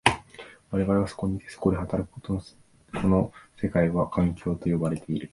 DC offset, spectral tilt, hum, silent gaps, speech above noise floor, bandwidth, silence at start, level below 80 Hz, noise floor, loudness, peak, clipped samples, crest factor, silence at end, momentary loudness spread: under 0.1%; -6.5 dB/octave; none; none; 22 dB; 11.5 kHz; 0.05 s; -44 dBFS; -48 dBFS; -27 LUFS; -2 dBFS; under 0.1%; 26 dB; 0.05 s; 9 LU